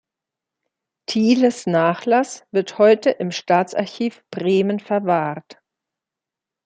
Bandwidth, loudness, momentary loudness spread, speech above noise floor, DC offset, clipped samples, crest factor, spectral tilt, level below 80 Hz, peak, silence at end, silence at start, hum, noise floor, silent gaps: 9.4 kHz; -19 LUFS; 10 LU; 68 dB; under 0.1%; under 0.1%; 16 dB; -5.5 dB/octave; -70 dBFS; -4 dBFS; 1.15 s; 1.1 s; none; -87 dBFS; none